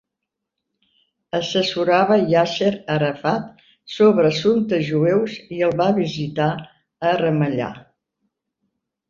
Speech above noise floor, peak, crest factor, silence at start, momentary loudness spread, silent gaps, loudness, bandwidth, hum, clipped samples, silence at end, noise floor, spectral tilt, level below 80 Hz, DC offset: 63 dB; -2 dBFS; 18 dB; 1.35 s; 10 LU; none; -19 LUFS; 7.4 kHz; none; under 0.1%; 1.3 s; -82 dBFS; -6.5 dB/octave; -60 dBFS; under 0.1%